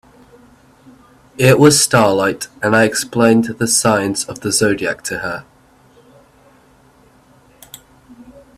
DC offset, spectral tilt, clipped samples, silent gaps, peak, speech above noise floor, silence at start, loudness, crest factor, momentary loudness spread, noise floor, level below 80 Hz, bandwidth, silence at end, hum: under 0.1%; -4 dB/octave; under 0.1%; none; 0 dBFS; 35 dB; 1.4 s; -14 LUFS; 18 dB; 13 LU; -49 dBFS; -52 dBFS; 16 kHz; 0.8 s; none